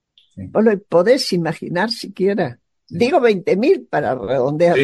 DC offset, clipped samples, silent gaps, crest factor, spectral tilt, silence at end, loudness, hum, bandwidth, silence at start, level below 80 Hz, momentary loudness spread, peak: under 0.1%; under 0.1%; none; 14 dB; -6 dB/octave; 0 s; -17 LUFS; none; 12.5 kHz; 0.35 s; -58 dBFS; 8 LU; -2 dBFS